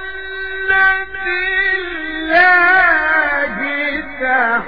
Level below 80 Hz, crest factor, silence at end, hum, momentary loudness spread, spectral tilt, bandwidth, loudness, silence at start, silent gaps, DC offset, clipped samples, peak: -42 dBFS; 14 dB; 0 s; none; 13 LU; -5.5 dB/octave; 5.2 kHz; -14 LUFS; 0 s; none; 2%; under 0.1%; 0 dBFS